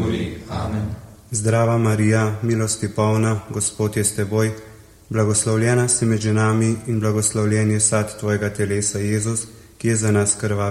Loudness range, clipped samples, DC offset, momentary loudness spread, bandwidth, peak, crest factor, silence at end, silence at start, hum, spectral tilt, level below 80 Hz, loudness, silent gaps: 2 LU; under 0.1%; under 0.1%; 9 LU; 13.5 kHz; -4 dBFS; 16 dB; 0 s; 0 s; none; -5 dB/octave; -46 dBFS; -20 LUFS; none